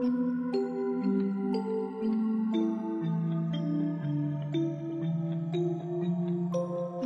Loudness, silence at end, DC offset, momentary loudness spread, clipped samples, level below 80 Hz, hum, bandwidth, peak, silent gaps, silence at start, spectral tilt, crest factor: -31 LUFS; 0 s; under 0.1%; 3 LU; under 0.1%; -76 dBFS; none; 6.8 kHz; -18 dBFS; none; 0 s; -9.5 dB/octave; 12 dB